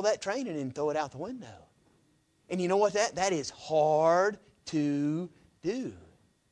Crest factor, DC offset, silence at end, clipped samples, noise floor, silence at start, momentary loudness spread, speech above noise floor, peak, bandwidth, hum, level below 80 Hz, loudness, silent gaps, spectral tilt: 18 dB; under 0.1%; 0.5 s; under 0.1%; -69 dBFS; 0 s; 16 LU; 39 dB; -14 dBFS; 10.5 kHz; none; -68 dBFS; -30 LUFS; none; -5 dB/octave